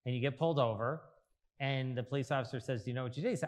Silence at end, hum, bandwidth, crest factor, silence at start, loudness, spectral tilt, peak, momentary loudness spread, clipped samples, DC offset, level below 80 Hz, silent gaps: 0 s; none; 11 kHz; 18 dB; 0.05 s; -36 LUFS; -6.5 dB/octave; -18 dBFS; 7 LU; under 0.1%; under 0.1%; -78 dBFS; none